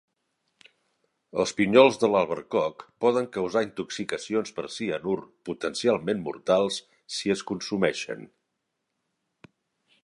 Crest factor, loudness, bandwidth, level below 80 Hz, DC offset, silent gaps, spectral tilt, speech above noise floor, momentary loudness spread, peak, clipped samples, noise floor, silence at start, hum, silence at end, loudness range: 24 dB; -26 LUFS; 11.5 kHz; -66 dBFS; under 0.1%; none; -4.5 dB/octave; 55 dB; 14 LU; -2 dBFS; under 0.1%; -80 dBFS; 1.35 s; none; 1.8 s; 5 LU